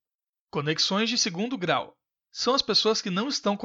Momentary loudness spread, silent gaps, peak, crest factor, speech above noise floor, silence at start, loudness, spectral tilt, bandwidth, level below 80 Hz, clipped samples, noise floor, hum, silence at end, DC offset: 10 LU; none; -10 dBFS; 18 dB; over 64 dB; 0.55 s; -25 LUFS; -3 dB/octave; 8 kHz; -68 dBFS; under 0.1%; under -90 dBFS; none; 0 s; under 0.1%